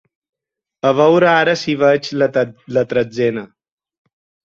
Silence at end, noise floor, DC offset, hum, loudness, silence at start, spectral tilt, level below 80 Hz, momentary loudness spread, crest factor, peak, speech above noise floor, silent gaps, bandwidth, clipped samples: 1.05 s; -73 dBFS; under 0.1%; none; -15 LUFS; 0.85 s; -6 dB/octave; -60 dBFS; 8 LU; 16 dB; -2 dBFS; 58 dB; none; 7.6 kHz; under 0.1%